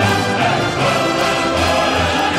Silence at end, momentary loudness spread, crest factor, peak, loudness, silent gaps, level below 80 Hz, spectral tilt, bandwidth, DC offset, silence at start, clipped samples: 0 s; 1 LU; 14 dB; -2 dBFS; -15 LUFS; none; -40 dBFS; -4 dB/octave; 16 kHz; under 0.1%; 0 s; under 0.1%